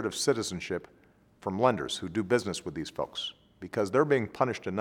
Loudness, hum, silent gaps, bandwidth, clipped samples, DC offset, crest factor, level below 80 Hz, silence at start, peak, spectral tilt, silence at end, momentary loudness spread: -30 LUFS; none; none; 17.5 kHz; under 0.1%; under 0.1%; 22 dB; -62 dBFS; 0 s; -8 dBFS; -4.5 dB/octave; 0 s; 10 LU